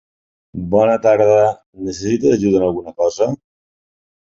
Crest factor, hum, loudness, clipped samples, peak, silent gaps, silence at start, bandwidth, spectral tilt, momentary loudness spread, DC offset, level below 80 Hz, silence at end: 16 dB; none; -15 LUFS; under 0.1%; -2 dBFS; 1.66-1.73 s; 0.55 s; 7.8 kHz; -6.5 dB/octave; 15 LU; under 0.1%; -48 dBFS; 1 s